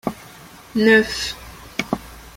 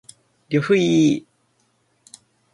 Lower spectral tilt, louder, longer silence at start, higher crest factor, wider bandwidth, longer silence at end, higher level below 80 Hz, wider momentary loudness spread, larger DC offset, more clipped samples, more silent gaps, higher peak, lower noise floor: second, -4 dB/octave vs -6 dB/octave; about the same, -20 LUFS vs -19 LUFS; second, 0.05 s vs 0.5 s; about the same, 20 dB vs 16 dB; first, 16.5 kHz vs 11.5 kHz; second, 0.1 s vs 1.35 s; first, -46 dBFS vs -64 dBFS; first, 17 LU vs 8 LU; neither; neither; neither; first, -2 dBFS vs -6 dBFS; second, -42 dBFS vs -65 dBFS